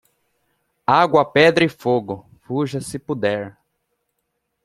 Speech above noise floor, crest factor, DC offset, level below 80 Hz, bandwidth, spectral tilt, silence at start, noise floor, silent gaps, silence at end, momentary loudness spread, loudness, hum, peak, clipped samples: 56 dB; 20 dB; under 0.1%; -58 dBFS; 14.5 kHz; -5.5 dB/octave; 0.9 s; -74 dBFS; none; 1.15 s; 15 LU; -19 LUFS; none; 0 dBFS; under 0.1%